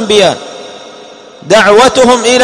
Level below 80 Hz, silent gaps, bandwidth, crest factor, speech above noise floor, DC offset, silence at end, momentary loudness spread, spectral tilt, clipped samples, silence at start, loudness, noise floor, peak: -42 dBFS; none; 15 kHz; 8 dB; 26 dB; under 0.1%; 0 s; 22 LU; -3 dB/octave; 3%; 0 s; -6 LUFS; -32 dBFS; 0 dBFS